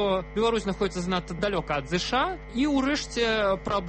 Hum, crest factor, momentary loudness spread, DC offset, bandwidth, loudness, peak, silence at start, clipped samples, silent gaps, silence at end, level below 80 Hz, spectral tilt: none; 14 dB; 5 LU; under 0.1%; 8.8 kHz; -27 LUFS; -12 dBFS; 0 s; under 0.1%; none; 0 s; -42 dBFS; -4.5 dB/octave